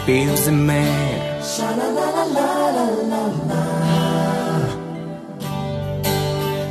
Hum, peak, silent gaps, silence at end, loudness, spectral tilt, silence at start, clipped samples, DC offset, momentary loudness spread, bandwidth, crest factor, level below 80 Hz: none; -4 dBFS; none; 0 s; -20 LUFS; -5.5 dB/octave; 0 s; under 0.1%; under 0.1%; 9 LU; 13.5 kHz; 16 dB; -44 dBFS